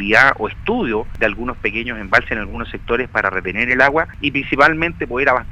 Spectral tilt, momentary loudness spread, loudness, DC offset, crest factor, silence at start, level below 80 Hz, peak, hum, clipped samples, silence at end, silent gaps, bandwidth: -5.5 dB/octave; 9 LU; -17 LUFS; under 0.1%; 18 dB; 0 s; -34 dBFS; 0 dBFS; none; under 0.1%; 0 s; none; 14.5 kHz